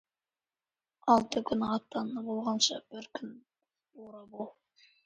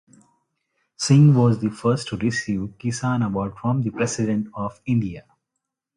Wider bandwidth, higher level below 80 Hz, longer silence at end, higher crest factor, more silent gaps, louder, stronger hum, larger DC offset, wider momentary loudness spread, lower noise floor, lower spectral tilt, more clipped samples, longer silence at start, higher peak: second, 9.4 kHz vs 11.5 kHz; second, -70 dBFS vs -52 dBFS; second, 0.55 s vs 0.75 s; first, 24 dB vs 18 dB; neither; second, -31 LUFS vs -22 LUFS; neither; neither; first, 20 LU vs 13 LU; first, under -90 dBFS vs -81 dBFS; second, -3.5 dB/octave vs -6.5 dB/octave; neither; about the same, 1.05 s vs 1 s; second, -12 dBFS vs -4 dBFS